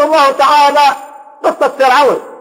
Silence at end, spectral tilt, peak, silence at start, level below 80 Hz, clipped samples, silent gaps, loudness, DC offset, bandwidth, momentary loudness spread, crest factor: 0.05 s; -2 dB/octave; 0 dBFS; 0 s; -60 dBFS; under 0.1%; none; -10 LUFS; under 0.1%; 16.5 kHz; 9 LU; 10 dB